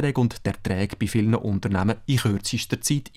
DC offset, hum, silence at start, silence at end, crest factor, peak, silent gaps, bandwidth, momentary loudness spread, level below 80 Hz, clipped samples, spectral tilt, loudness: under 0.1%; none; 0 s; 0.1 s; 14 dB; -10 dBFS; none; 16 kHz; 4 LU; -48 dBFS; under 0.1%; -5.5 dB/octave; -24 LUFS